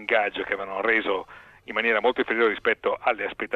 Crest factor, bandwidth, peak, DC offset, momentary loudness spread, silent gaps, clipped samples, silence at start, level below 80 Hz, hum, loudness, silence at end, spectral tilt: 18 dB; 6.4 kHz; -8 dBFS; under 0.1%; 7 LU; none; under 0.1%; 0 s; -60 dBFS; none; -24 LUFS; 0 s; -5 dB/octave